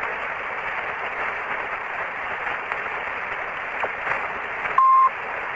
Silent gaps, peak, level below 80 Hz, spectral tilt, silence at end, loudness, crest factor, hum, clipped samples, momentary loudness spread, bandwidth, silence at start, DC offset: none; -4 dBFS; -56 dBFS; -4 dB/octave; 0 s; -24 LUFS; 20 dB; none; under 0.1%; 10 LU; 7.8 kHz; 0 s; under 0.1%